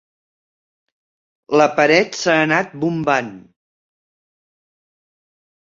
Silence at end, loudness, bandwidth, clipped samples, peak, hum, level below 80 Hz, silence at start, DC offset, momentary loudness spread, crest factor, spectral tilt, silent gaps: 2.35 s; -16 LUFS; 7.6 kHz; under 0.1%; -2 dBFS; none; -62 dBFS; 1.5 s; under 0.1%; 7 LU; 20 dB; -4.5 dB/octave; none